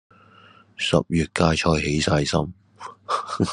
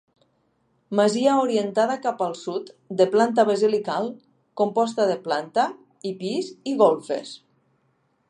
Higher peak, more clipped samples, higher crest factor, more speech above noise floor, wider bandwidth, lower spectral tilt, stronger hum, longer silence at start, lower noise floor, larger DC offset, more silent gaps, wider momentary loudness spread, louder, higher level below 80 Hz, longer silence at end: about the same, -2 dBFS vs -4 dBFS; neither; about the same, 22 dB vs 20 dB; second, 30 dB vs 46 dB; about the same, 11 kHz vs 11 kHz; about the same, -5 dB/octave vs -5 dB/octave; neither; about the same, 0.8 s vs 0.9 s; second, -52 dBFS vs -68 dBFS; neither; neither; first, 16 LU vs 13 LU; about the same, -22 LUFS vs -23 LUFS; first, -44 dBFS vs -78 dBFS; second, 0 s vs 0.95 s